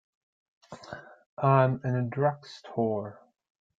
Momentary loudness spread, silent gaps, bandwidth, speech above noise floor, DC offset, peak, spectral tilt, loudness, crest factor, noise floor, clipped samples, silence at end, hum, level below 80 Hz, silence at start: 22 LU; 1.26-1.37 s; 7.6 kHz; 19 dB; under 0.1%; -8 dBFS; -8.5 dB/octave; -28 LUFS; 22 dB; -46 dBFS; under 0.1%; 0.65 s; none; -66 dBFS; 0.7 s